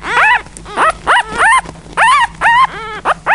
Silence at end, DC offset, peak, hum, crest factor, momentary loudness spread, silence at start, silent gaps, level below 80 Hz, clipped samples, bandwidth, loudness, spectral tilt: 0 s; 0.4%; 0 dBFS; none; 12 dB; 8 LU; 0 s; none; -38 dBFS; under 0.1%; 11.5 kHz; -11 LUFS; -1.5 dB/octave